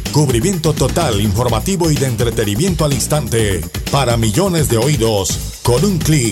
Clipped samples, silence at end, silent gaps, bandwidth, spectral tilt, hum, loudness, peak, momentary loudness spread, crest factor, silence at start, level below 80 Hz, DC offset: under 0.1%; 0 s; none; 17 kHz; -5 dB/octave; none; -15 LUFS; -2 dBFS; 3 LU; 12 dB; 0 s; -28 dBFS; under 0.1%